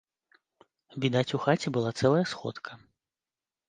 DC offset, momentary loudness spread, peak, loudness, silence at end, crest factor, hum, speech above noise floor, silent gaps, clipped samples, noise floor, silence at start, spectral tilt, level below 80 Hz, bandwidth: under 0.1%; 17 LU; -10 dBFS; -28 LUFS; 0.9 s; 22 dB; none; over 62 dB; none; under 0.1%; under -90 dBFS; 0.95 s; -6 dB/octave; -68 dBFS; 9.8 kHz